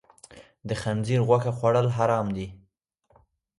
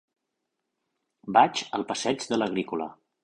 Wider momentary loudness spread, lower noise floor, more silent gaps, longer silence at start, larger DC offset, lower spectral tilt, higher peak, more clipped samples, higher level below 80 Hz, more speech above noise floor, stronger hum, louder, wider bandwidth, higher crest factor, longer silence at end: about the same, 12 LU vs 13 LU; second, -68 dBFS vs -82 dBFS; neither; second, 0.3 s vs 1.25 s; neither; first, -7 dB/octave vs -4 dB/octave; about the same, -6 dBFS vs -6 dBFS; neither; first, -56 dBFS vs -70 dBFS; second, 44 dB vs 56 dB; neither; about the same, -25 LUFS vs -26 LUFS; about the same, 11.5 kHz vs 11 kHz; about the same, 20 dB vs 24 dB; first, 1.05 s vs 0.3 s